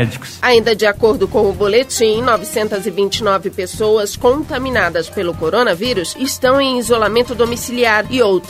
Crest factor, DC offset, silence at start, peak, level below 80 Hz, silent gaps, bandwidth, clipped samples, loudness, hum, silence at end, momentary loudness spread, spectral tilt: 14 dB; under 0.1%; 0 s; 0 dBFS; -40 dBFS; none; 16 kHz; under 0.1%; -15 LUFS; none; 0 s; 6 LU; -4 dB/octave